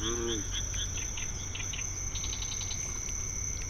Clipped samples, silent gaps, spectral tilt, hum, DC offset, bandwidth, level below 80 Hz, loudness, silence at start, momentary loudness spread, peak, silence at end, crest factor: under 0.1%; none; -2 dB/octave; none; under 0.1%; 19 kHz; -40 dBFS; -34 LUFS; 0 s; 3 LU; -20 dBFS; 0 s; 14 dB